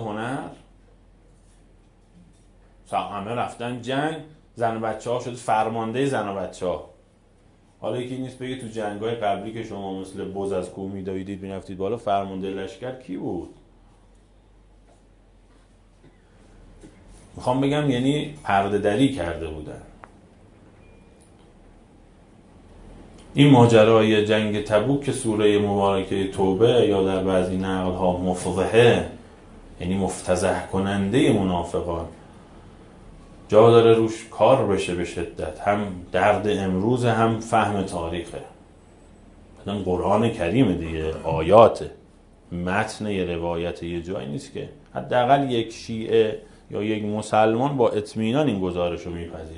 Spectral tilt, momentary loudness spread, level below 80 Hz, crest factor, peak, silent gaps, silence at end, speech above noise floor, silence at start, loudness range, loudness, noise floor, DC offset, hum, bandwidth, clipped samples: -6.5 dB/octave; 15 LU; -50 dBFS; 24 dB; 0 dBFS; none; 0 s; 34 dB; 0 s; 11 LU; -22 LUFS; -56 dBFS; under 0.1%; none; 11 kHz; under 0.1%